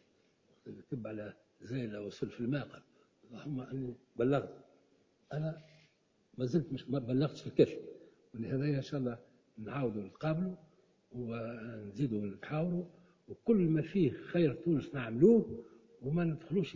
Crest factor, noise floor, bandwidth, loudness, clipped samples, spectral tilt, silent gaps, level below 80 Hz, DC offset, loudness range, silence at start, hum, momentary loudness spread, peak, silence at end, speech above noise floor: 24 dB; -72 dBFS; 7.4 kHz; -35 LUFS; under 0.1%; -9 dB/octave; none; -66 dBFS; under 0.1%; 9 LU; 0.65 s; none; 19 LU; -12 dBFS; 0 s; 37 dB